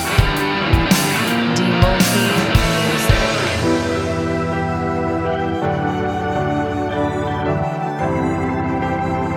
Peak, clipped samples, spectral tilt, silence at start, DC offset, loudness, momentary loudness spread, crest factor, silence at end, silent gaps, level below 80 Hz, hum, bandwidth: 0 dBFS; under 0.1%; -5 dB/octave; 0 s; under 0.1%; -18 LUFS; 6 LU; 18 dB; 0 s; none; -28 dBFS; none; over 20 kHz